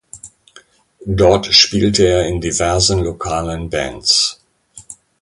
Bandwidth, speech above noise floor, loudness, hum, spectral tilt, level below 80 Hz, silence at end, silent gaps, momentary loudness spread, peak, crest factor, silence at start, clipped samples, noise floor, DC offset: 11.5 kHz; 33 dB; -14 LUFS; none; -3.5 dB/octave; -32 dBFS; 0.3 s; none; 12 LU; 0 dBFS; 16 dB; 0.15 s; under 0.1%; -47 dBFS; under 0.1%